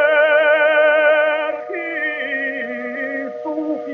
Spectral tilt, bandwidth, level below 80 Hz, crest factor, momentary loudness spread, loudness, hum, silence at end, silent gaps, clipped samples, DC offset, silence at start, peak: -4.5 dB/octave; 4 kHz; -82 dBFS; 14 dB; 12 LU; -17 LUFS; none; 0 s; none; under 0.1%; under 0.1%; 0 s; -4 dBFS